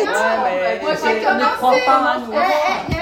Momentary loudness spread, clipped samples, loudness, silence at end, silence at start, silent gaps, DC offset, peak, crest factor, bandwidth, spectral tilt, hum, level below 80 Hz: 5 LU; under 0.1%; -16 LUFS; 0 s; 0 s; none; under 0.1%; -2 dBFS; 16 dB; 16.5 kHz; -4 dB/octave; none; -42 dBFS